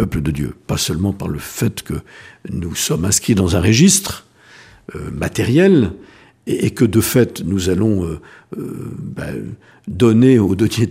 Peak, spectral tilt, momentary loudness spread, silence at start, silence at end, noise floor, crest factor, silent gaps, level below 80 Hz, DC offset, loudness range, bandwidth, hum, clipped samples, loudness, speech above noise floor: 0 dBFS; -5 dB/octave; 19 LU; 0 s; 0 s; -44 dBFS; 16 dB; none; -38 dBFS; under 0.1%; 4 LU; 15.5 kHz; none; under 0.1%; -16 LUFS; 28 dB